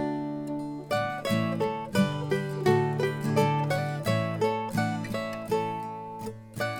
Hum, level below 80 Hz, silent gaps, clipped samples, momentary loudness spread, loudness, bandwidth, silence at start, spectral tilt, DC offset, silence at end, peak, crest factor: none; -60 dBFS; none; under 0.1%; 10 LU; -29 LUFS; 18.5 kHz; 0 s; -6.5 dB/octave; under 0.1%; 0 s; -10 dBFS; 18 dB